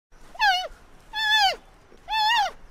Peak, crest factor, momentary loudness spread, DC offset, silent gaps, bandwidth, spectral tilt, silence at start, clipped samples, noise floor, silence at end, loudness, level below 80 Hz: -10 dBFS; 16 dB; 15 LU; under 0.1%; none; 16 kHz; 1 dB/octave; 0.2 s; under 0.1%; -50 dBFS; 0.05 s; -22 LUFS; -50 dBFS